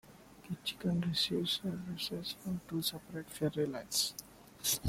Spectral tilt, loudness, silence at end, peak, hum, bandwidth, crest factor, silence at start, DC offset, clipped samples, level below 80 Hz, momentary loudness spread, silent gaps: -3.5 dB/octave; -36 LUFS; 0 s; -18 dBFS; none; 16.5 kHz; 18 dB; 0.05 s; under 0.1%; under 0.1%; -66 dBFS; 12 LU; none